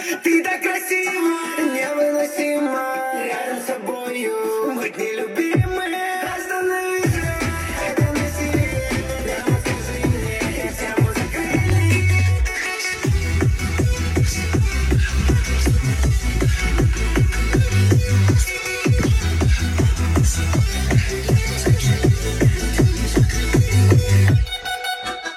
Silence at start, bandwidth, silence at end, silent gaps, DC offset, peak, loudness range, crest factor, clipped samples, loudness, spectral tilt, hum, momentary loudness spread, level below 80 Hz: 0 s; 16 kHz; 0 s; none; under 0.1%; -2 dBFS; 4 LU; 16 dB; under 0.1%; -19 LUFS; -5.5 dB/octave; none; 7 LU; -26 dBFS